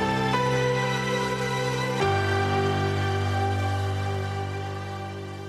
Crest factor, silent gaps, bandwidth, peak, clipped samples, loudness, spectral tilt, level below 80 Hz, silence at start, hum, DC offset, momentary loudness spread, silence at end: 14 dB; none; 13.5 kHz; -10 dBFS; under 0.1%; -26 LUFS; -5.5 dB/octave; -52 dBFS; 0 s; none; under 0.1%; 9 LU; 0 s